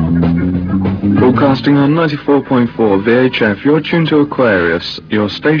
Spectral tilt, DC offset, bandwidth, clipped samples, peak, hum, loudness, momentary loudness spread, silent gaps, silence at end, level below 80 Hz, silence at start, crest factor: -8.5 dB/octave; under 0.1%; 5.4 kHz; under 0.1%; 0 dBFS; none; -12 LUFS; 5 LU; none; 0 s; -38 dBFS; 0 s; 12 dB